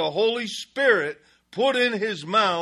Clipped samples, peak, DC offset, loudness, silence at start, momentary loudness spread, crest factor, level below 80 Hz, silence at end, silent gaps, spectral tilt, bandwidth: under 0.1%; -4 dBFS; under 0.1%; -23 LUFS; 0 s; 10 LU; 18 dB; -72 dBFS; 0 s; none; -3.5 dB/octave; 12.5 kHz